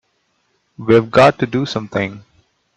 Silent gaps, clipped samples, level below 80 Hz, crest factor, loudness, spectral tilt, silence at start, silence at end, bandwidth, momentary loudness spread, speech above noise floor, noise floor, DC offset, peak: none; under 0.1%; -54 dBFS; 18 dB; -15 LUFS; -6.5 dB/octave; 0.8 s; 0.55 s; 9.6 kHz; 12 LU; 50 dB; -65 dBFS; under 0.1%; 0 dBFS